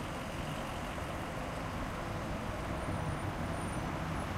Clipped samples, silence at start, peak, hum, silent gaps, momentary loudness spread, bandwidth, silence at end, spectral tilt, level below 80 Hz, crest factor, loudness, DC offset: under 0.1%; 0 s; -24 dBFS; none; none; 2 LU; 16 kHz; 0 s; -5.5 dB/octave; -46 dBFS; 14 dB; -39 LUFS; under 0.1%